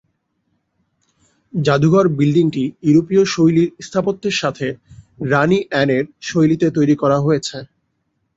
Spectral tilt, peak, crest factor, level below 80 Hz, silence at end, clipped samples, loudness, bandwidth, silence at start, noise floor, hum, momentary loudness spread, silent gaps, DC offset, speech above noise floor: -6.5 dB/octave; -2 dBFS; 16 dB; -54 dBFS; 0.7 s; under 0.1%; -16 LUFS; 8 kHz; 1.55 s; -69 dBFS; none; 11 LU; none; under 0.1%; 53 dB